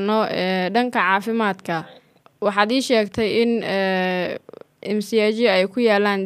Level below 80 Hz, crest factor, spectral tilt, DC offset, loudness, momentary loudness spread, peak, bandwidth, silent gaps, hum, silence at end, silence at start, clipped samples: -62 dBFS; 18 dB; -5 dB/octave; under 0.1%; -20 LUFS; 9 LU; -2 dBFS; 15 kHz; none; none; 0 s; 0 s; under 0.1%